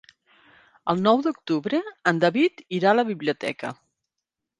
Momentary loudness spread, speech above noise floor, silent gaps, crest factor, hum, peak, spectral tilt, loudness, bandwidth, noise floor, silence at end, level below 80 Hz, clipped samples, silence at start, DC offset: 10 LU; 62 dB; none; 20 dB; none; -4 dBFS; -6.5 dB/octave; -23 LUFS; 11 kHz; -85 dBFS; 0.85 s; -70 dBFS; under 0.1%; 0.85 s; under 0.1%